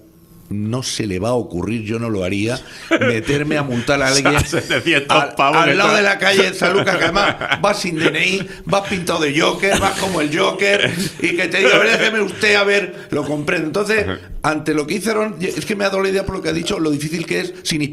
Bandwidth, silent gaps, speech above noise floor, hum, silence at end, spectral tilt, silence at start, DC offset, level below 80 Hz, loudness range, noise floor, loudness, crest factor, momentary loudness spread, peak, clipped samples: 14.5 kHz; none; 27 dB; none; 0 s; -4 dB/octave; 0.5 s; under 0.1%; -42 dBFS; 5 LU; -44 dBFS; -16 LUFS; 18 dB; 9 LU; 0 dBFS; under 0.1%